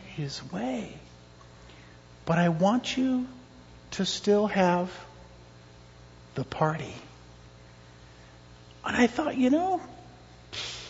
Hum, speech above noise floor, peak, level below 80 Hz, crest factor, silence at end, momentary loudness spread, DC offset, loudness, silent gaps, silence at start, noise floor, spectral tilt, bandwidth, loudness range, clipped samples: 60 Hz at -50 dBFS; 25 dB; -10 dBFS; -58 dBFS; 20 dB; 0 s; 22 LU; under 0.1%; -28 LUFS; none; 0 s; -51 dBFS; -5.5 dB/octave; 8 kHz; 10 LU; under 0.1%